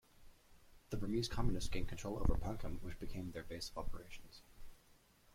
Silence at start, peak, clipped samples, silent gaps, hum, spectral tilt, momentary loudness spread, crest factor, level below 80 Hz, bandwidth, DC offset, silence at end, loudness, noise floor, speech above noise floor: 0.2 s; -18 dBFS; under 0.1%; none; none; -5.5 dB/octave; 17 LU; 22 dB; -46 dBFS; 15 kHz; under 0.1%; 0.6 s; -44 LUFS; -68 dBFS; 30 dB